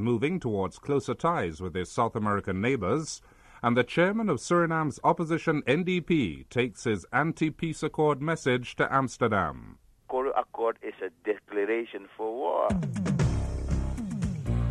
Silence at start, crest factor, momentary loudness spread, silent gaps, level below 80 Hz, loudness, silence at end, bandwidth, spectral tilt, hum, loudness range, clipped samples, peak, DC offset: 0 s; 18 dB; 7 LU; none; -42 dBFS; -28 LUFS; 0 s; 12 kHz; -6.5 dB/octave; none; 4 LU; under 0.1%; -10 dBFS; under 0.1%